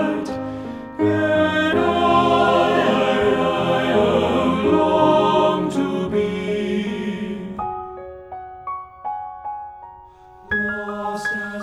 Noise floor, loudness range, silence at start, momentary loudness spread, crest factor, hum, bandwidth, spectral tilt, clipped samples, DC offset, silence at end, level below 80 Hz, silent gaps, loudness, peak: -44 dBFS; 12 LU; 0 s; 16 LU; 16 dB; none; 13 kHz; -6 dB/octave; under 0.1%; under 0.1%; 0 s; -48 dBFS; none; -19 LUFS; -4 dBFS